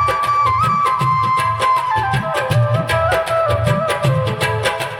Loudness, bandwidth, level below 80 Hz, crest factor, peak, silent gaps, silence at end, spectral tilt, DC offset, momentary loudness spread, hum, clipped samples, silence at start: -16 LUFS; 17 kHz; -42 dBFS; 12 dB; -4 dBFS; none; 0 s; -5.5 dB/octave; under 0.1%; 3 LU; none; under 0.1%; 0 s